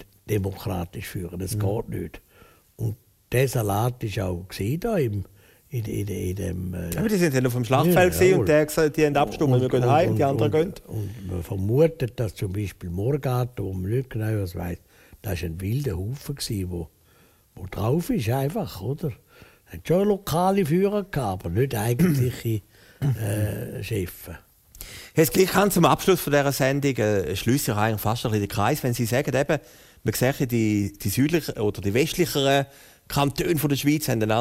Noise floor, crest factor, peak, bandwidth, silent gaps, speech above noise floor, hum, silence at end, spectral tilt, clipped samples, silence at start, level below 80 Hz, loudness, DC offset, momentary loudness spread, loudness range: -58 dBFS; 20 dB; -4 dBFS; 16 kHz; none; 34 dB; none; 0 s; -6 dB/octave; under 0.1%; 0 s; -46 dBFS; -24 LUFS; under 0.1%; 13 LU; 8 LU